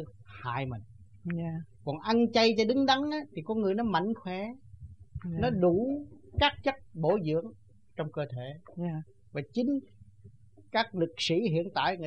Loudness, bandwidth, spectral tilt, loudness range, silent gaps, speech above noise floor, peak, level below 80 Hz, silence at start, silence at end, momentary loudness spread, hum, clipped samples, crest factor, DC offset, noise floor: -30 LUFS; 9.4 kHz; -6 dB/octave; 6 LU; none; 26 dB; -10 dBFS; -54 dBFS; 0 s; 0 s; 15 LU; none; under 0.1%; 22 dB; 0.1%; -56 dBFS